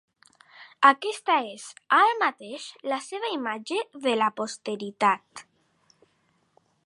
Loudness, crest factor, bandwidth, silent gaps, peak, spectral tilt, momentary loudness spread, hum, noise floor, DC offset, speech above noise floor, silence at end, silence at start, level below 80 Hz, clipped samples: -25 LUFS; 24 dB; 11.5 kHz; none; -4 dBFS; -3 dB/octave; 18 LU; none; -69 dBFS; under 0.1%; 43 dB; 1.45 s; 0.6 s; -86 dBFS; under 0.1%